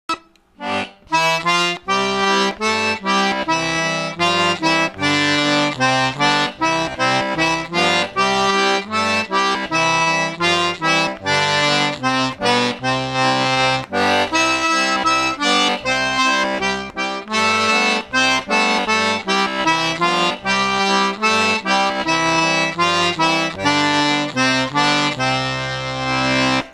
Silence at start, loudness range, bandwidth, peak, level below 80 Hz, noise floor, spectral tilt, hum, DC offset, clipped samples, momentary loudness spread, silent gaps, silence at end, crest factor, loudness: 0.1 s; 1 LU; 14 kHz; -2 dBFS; -50 dBFS; -38 dBFS; -3 dB/octave; none; under 0.1%; under 0.1%; 4 LU; none; 0 s; 16 dB; -17 LUFS